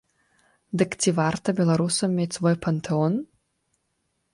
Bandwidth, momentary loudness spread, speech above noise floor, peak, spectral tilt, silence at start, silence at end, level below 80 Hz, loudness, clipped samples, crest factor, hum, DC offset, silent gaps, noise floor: 11.5 kHz; 5 LU; 51 dB; -8 dBFS; -5.5 dB/octave; 0.75 s; 1.1 s; -60 dBFS; -24 LUFS; under 0.1%; 16 dB; none; under 0.1%; none; -74 dBFS